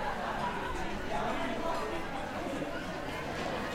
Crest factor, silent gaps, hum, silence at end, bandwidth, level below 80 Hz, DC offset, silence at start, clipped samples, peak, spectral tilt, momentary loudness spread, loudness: 14 dB; none; none; 0 s; 16 kHz; -48 dBFS; under 0.1%; 0 s; under 0.1%; -22 dBFS; -5 dB/octave; 3 LU; -36 LUFS